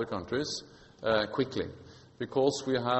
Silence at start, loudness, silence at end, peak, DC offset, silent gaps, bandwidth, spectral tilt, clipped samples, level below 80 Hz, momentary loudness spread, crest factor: 0 s; -32 LUFS; 0 s; -12 dBFS; under 0.1%; none; 8.2 kHz; -4.5 dB/octave; under 0.1%; -62 dBFS; 12 LU; 20 dB